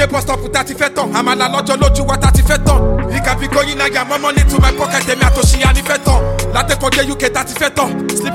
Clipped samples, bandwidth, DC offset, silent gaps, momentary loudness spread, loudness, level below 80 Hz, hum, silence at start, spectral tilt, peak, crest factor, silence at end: under 0.1%; 16.5 kHz; under 0.1%; none; 5 LU; -13 LUFS; -16 dBFS; none; 0 s; -4.5 dB/octave; 0 dBFS; 12 dB; 0 s